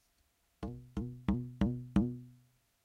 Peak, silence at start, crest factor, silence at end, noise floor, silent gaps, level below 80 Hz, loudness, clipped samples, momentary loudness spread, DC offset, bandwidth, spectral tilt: -16 dBFS; 0.6 s; 22 dB; 0.5 s; -75 dBFS; none; -48 dBFS; -37 LUFS; under 0.1%; 13 LU; under 0.1%; 10 kHz; -9 dB/octave